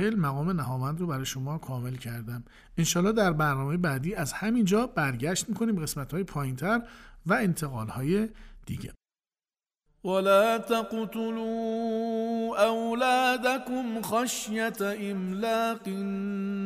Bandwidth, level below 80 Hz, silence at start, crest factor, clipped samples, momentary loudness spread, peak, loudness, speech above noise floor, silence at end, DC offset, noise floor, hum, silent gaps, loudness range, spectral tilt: 15.5 kHz; -54 dBFS; 0 s; 18 dB; under 0.1%; 11 LU; -10 dBFS; -28 LUFS; over 62 dB; 0 s; under 0.1%; under -90 dBFS; none; none; 4 LU; -5 dB/octave